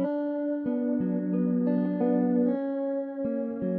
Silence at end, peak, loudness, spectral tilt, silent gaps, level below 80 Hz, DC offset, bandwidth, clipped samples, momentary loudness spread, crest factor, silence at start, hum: 0 s; -14 dBFS; -28 LUFS; -12.5 dB/octave; none; -72 dBFS; under 0.1%; 3.4 kHz; under 0.1%; 6 LU; 12 dB; 0 s; none